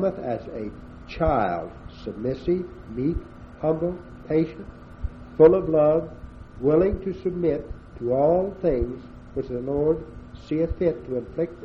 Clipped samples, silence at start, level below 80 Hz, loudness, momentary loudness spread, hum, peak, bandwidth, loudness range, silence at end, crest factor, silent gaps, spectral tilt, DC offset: under 0.1%; 0 s; -40 dBFS; -24 LUFS; 19 LU; none; -4 dBFS; 6 kHz; 6 LU; 0 s; 20 dB; none; -10 dB/octave; under 0.1%